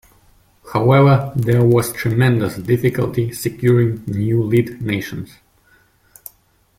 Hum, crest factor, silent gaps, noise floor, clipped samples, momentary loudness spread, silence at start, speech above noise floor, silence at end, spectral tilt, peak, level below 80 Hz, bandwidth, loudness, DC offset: none; 16 dB; none; -56 dBFS; under 0.1%; 10 LU; 0.65 s; 41 dB; 1.55 s; -7.5 dB/octave; -2 dBFS; -48 dBFS; 16 kHz; -17 LUFS; under 0.1%